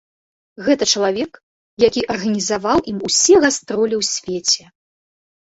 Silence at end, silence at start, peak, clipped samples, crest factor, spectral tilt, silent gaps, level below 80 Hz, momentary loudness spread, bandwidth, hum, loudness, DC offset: 0.9 s; 0.6 s; -2 dBFS; under 0.1%; 16 dB; -2.5 dB/octave; 1.43-1.77 s; -50 dBFS; 8 LU; 8.2 kHz; none; -17 LUFS; under 0.1%